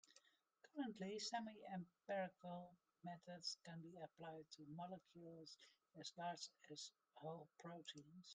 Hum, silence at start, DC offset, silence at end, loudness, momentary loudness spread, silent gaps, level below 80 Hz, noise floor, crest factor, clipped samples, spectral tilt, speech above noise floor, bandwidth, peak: none; 0.05 s; under 0.1%; 0 s; -54 LUFS; 12 LU; none; under -90 dBFS; -77 dBFS; 20 dB; under 0.1%; -4 dB/octave; 23 dB; 9.4 kHz; -36 dBFS